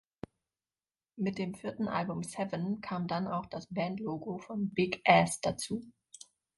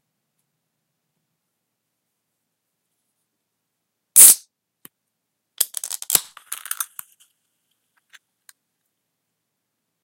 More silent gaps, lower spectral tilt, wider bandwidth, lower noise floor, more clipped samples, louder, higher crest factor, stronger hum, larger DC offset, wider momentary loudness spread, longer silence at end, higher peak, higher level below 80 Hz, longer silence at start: neither; first, -5 dB/octave vs 2.5 dB/octave; second, 11.5 kHz vs 17 kHz; first, under -90 dBFS vs -78 dBFS; neither; second, -33 LUFS vs -13 LUFS; about the same, 26 dB vs 24 dB; neither; neither; first, 25 LU vs 22 LU; second, 0.65 s vs 3.2 s; second, -8 dBFS vs 0 dBFS; first, -66 dBFS vs -72 dBFS; second, 1.15 s vs 4.15 s